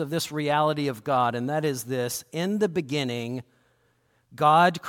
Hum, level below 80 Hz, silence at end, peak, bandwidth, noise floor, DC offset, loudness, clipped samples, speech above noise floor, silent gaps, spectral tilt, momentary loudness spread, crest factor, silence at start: none; -68 dBFS; 0 s; -8 dBFS; 17.5 kHz; -67 dBFS; under 0.1%; -25 LUFS; under 0.1%; 42 dB; none; -5 dB/octave; 10 LU; 18 dB; 0 s